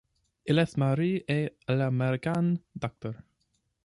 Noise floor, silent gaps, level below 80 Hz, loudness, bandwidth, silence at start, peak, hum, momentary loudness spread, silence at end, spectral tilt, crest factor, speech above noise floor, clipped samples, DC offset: -76 dBFS; none; -64 dBFS; -29 LUFS; 11.5 kHz; 0.45 s; -12 dBFS; none; 14 LU; 0.7 s; -8 dB/octave; 18 dB; 48 dB; under 0.1%; under 0.1%